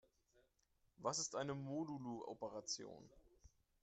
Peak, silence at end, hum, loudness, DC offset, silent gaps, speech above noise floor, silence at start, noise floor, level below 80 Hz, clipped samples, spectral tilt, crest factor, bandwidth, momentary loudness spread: -28 dBFS; 0.35 s; none; -46 LUFS; under 0.1%; none; 34 dB; 1 s; -81 dBFS; -78 dBFS; under 0.1%; -3.5 dB/octave; 22 dB; 8.8 kHz; 7 LU